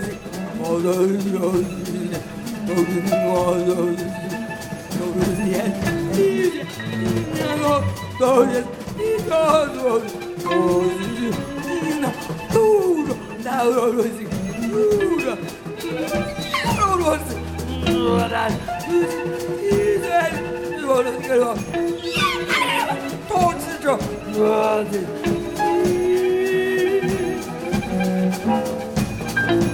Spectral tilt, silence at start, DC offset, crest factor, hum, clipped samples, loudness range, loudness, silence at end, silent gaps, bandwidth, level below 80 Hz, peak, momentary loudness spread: -5.5 dB/octave; 0 s; under 0.1%; 18 dB; none; under 0.1%; 2 LU; -21 LUFS; 0 s; none; 18 kHz; -44 dBFS; -4 dBFS; 9 LU